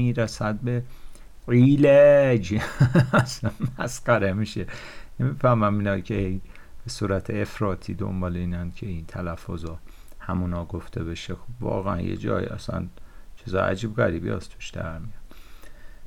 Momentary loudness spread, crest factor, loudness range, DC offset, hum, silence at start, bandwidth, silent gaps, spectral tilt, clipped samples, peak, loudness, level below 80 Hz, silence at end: 18 LU; 16 dB; 12 LU; under 0.1%; none; 0 s; 14 kHz; none; -7 dB/octave; under 0.1%; -8 dBFS; -24 LUFS; -42 dBFS; 0 s